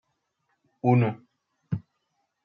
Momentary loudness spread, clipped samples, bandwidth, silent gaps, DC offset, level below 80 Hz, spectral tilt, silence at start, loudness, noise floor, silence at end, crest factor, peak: 13 LU; under 0.1%; 4.9 kHz; none; under 0.1%; -68 dBFS; -10.5 dB/octave; 0.85 s; -27 LUFS; -77 dBFS; 0.65 s; 20 dB; -8 dBFS